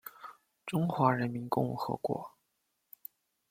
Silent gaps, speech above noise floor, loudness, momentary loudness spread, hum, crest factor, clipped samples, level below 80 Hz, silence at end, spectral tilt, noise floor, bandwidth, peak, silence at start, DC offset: none; 49 dB; -33 LUFS; 22 LU; none; 24 dB; under 0.1%; -70 dBFS; 1.2 s; -7.5 dB/octave; -80 dBFS; 16.5 kHz; -10 dBFS; 0.05 s; under 0.1%